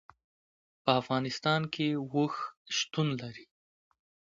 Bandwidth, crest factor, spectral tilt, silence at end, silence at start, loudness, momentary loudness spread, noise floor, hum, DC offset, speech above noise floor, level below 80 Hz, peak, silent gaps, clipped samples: 7.6 kHz; 24 dB; -5 dB/octave; 0.9 s; 0.85 s; -31 LUFS; 10 LU; under -90 dBFS; none; under 0.1%; over 59 dB; -72 dBFS; -10 dBFS; 2.57-2.65 s; under 0.1%